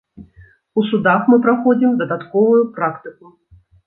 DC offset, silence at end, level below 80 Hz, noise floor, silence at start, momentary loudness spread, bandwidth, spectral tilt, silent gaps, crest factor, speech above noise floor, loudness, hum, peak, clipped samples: under 0.1%; 0.75 s; -58 dBFS; -48 dBFS; 0.2 s; 10 LU; 4 kHz; -10 dB/octave; none; 14 dB; 33 dB; -16 LUFS; none; -2 dBFS; under 0.1%